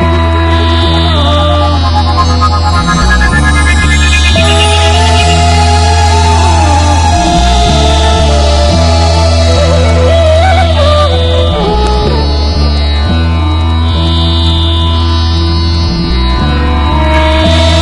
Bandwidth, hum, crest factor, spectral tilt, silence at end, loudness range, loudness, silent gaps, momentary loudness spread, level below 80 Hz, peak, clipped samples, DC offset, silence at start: 11 kHz; none; 6 dB; -5 dB/octave; 0 s; 3 LU; -8 LUFS; none; 4 LU; -14 dBFS; 0 dBFS; 0.9%; under 0.1%; 0 s